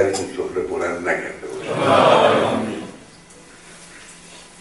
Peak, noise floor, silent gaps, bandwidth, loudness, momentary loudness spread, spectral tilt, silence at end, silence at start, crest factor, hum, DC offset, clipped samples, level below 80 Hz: 0 dBFS; -44 dBFS; none; 11.5 kHz; -19 LUFS; 26 LU; -4.5 dB/octave; 0.15 s; 0 s; 20 dB; none; 0.1%; under 0.1%; -56 dBFS